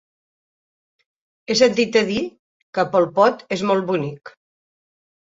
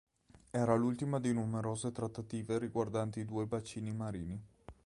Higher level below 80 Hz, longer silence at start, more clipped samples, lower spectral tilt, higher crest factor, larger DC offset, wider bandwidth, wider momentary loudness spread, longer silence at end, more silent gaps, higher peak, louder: about the same, -62 dBFS vs -62 dBFS; first, 1.5 s vs 0.55 s; neither; second, -4.5 dB/octave vs -7 dB/octave; about the same, 20 dB vs 22 dB; neither; second, 8 kHz vs 11.5 kHz; first, 13 LU vs 10 LU; first, 0.95 s vs 0.15 s; first, 2.39-2.73 s vs none; first, -2 dBFS vs -16 dBFS; first, -19 LUFS vs -37 LUFS